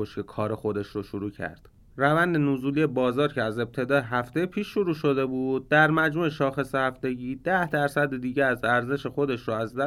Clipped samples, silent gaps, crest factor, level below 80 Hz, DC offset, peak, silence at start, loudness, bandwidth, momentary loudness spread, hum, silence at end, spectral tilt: under 0.1%; none; 18 dB; -56 dBFS; under 0.1%; -8 dBFS; 0 s; -26 LUFS; 16 kHz; 9 LU; none; 0 s; -7 dB/octave